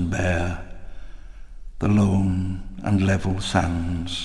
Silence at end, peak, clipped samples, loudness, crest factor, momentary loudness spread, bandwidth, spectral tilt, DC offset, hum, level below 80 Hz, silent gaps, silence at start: 0 s; -6 dBFS; under 0.1%; -23 LUFS; 18 dB; 11 LU; 11 kHz; -6.5 dB/octave; under 0.1%; none; -36 dBFS; none; 0 s